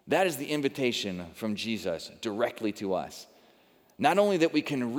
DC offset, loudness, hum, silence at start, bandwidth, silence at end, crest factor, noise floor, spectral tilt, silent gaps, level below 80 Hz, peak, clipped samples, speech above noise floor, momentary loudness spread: under 0.1%; -29 LUFS; none; 0.05 s; over 20 kHz; 0 s; 20 dB; -62 dBFS; -4.5 dB/octave; none; -72 dBFS; -10 dBFS; under 0.1%; 33 dB; 11 LU